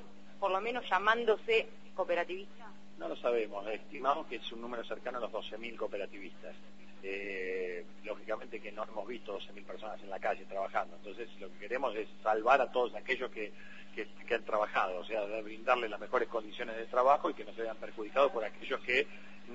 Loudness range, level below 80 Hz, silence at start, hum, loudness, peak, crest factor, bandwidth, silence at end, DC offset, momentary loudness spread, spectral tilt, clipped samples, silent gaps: 8 LU; -70 dBFS; 0 s; none; -35 LUFS; -12 dBFS; 22 dB; 7.6 kHz; 0 s; 0.5%; 16 LU; -1 dB/octave; under 0.1%; none